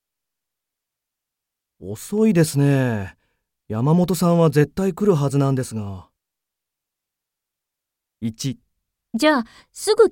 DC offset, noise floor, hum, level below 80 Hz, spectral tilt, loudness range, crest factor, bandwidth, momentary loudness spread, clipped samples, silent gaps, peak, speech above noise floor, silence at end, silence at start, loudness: under 0.1%; -84 dBFS; none; -54 dBFS; -6.5 dB/octave; 12 LU; 20 dB; 17 kHz; 18 LU; under 0.1%; none; -2 dBFS; 66 dB; 0 s; 1.8 s; -20 LUFS